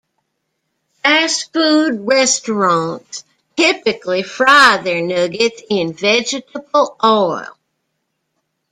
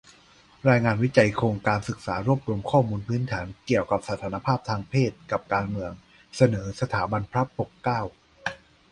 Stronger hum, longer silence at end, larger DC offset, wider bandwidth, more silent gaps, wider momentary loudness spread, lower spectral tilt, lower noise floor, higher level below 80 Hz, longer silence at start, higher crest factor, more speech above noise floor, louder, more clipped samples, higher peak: neither; first, 1.25 s vs 0.35 s; neither; first, 15 kHz vs 11 kHz; neither; about the same, 13 LU vs 11 LU; second, -2.5 dB/octave vs -7 dB/octave; first, -71 dBFS vs -55 dBFS; second, -62 dBFS vs -50 dBFS; first, 1.05 s vs 0.65 s; second, 16 dB vs 22 dB; first, 57 dB vs 31 dB; first, -14 LUFS vs -26 LUFS; neither; first, 0 dBFS vs -4 dBFS